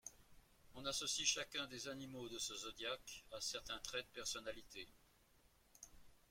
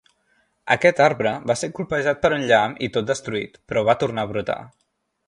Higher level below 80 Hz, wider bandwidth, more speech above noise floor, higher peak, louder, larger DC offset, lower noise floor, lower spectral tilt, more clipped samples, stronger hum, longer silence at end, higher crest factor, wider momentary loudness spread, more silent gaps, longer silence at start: second, -70 dBFS vs -54 dBFS; first, 16.5 kHz vs 11 kHz; second, 26 dB vs 45 dB; second, -22 dBFS vs 0 dBFS; second, -45 LUFS vs -21 LUFS; neither; first, -73 dBFS vs -65 dBFS; second, -1 dB/octave vs -4.5 dB/octave; neither; neither; second, 0.15 s vs 0.6 s; about the same, 26 dB vs 22 dB; first, 21 LU vs 11 LU; neither; second, 0.05 s vs 0.65 s